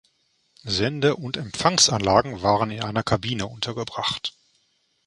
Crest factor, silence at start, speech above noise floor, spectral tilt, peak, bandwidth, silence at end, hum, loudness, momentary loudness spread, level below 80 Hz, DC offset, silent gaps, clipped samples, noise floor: 22 dB; 0.65 s; 45 dB; -3.5 dB/octave; -2 dBFS; 11.5 kHz; 0.75 s; none; -23 LUFS; 12 LU; -48 dBFS; under 0.1%; none; under 0.1%; -68 dBFS